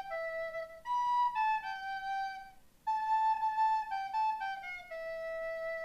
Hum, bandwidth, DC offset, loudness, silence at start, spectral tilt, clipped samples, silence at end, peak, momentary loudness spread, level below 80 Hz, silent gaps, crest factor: none; 14.5 kHz; under 0.1%; -35 LUFS; 0 s; -1.5 dB/octave; under 0.1%; 0 s; -24 dBFS; 11 LU; -66 dBFS; none; 12 dB